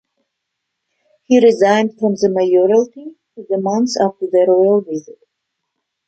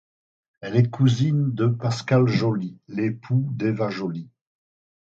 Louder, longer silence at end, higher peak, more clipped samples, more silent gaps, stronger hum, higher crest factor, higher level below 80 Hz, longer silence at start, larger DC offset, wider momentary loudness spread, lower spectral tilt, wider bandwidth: first, -14 LUFS vs -23 LUFS; about the same, 0.95 s vs 0.85 s; first, -2 dBFS vs -6 dBFS; neither; neither; neither; about the same, 14 dB vs 18 dB; second, -66 dBFS vs -60 dBFS; first, 1.3 s vs 0.6 s; neither; first, 14 LU vs 11 LU; second, -5.5 dB/octave vs -7.5 dB/octave; about the same, 8.4 kHz vs 7.8 kHz